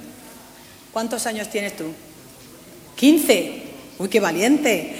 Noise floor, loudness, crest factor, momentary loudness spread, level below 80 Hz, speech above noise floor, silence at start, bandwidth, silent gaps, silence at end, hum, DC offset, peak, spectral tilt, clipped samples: -45 dBFS; -20 LUFS; 22 dB; 23 LU; -62 dBFS; 25 dB; 0 s; 16.5 kHz; none; 0 s; none; under 0.1%; 0 dBFS; -3.5 dB/octave; under 0.1%